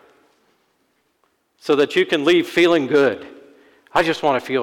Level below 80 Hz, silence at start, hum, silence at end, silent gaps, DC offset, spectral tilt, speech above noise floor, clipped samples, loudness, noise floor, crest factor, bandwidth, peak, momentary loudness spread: -60 dBFS; 1.65 s; none; 0 s; none; under 0.1%; -5 dB/octave; 49 dB; under 0.1%; -17 LUFS; -66 dBFS; 14 dB; 15.5 kHz; -6 dBFS; 6 LU